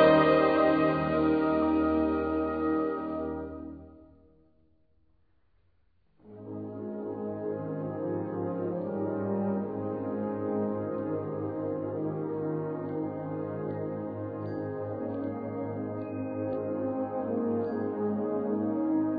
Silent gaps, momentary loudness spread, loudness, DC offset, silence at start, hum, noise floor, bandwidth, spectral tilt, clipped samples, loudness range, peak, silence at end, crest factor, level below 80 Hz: none; 10 LU; -31 LUFS; under 0.1%; 0 s; none; -71 dBFS; 5 kHz; -6.5 dB/octave; under 0.1%; 12 LU; -10 dBFS; 0 s; 20 dB; -56 dBFS